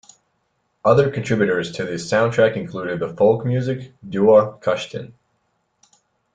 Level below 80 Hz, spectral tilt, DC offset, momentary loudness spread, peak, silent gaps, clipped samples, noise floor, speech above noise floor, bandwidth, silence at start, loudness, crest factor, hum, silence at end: -56 dBFS; -6.5 dB/octave; under 0.1%; 12 LU; -2 dBFS; none; under 0.1%; -69 dBFS; 51 dB; 9.2 kHz; 0.85 s; -19 LUFS; 18 dB; none; 1.25 s